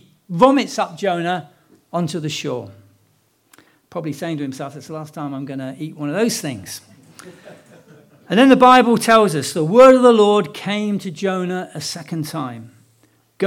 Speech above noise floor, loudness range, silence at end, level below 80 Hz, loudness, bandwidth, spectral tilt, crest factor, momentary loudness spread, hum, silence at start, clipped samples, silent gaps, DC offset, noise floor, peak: 44 dB; 15 LU; 0 s; -60 dBFS; -16 LUFS; 16 kHz; -5 dB/octave; 18 dB; 19 LU; none; 0.3 s; under 0.1%; none; under 0.1%; -60 dBFS; 0 dBFS